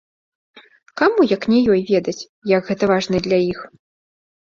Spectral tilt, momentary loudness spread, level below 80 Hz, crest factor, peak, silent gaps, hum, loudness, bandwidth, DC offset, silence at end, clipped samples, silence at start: -6 dB/octave; 12 LU; -54 dBFS; 18 dB; -2 dBFS; 2.29-2.42 s; none; -18 LUFS; 7.6 kHz; under 0.1%; 0.85 s; under 0.1%; 0.95 s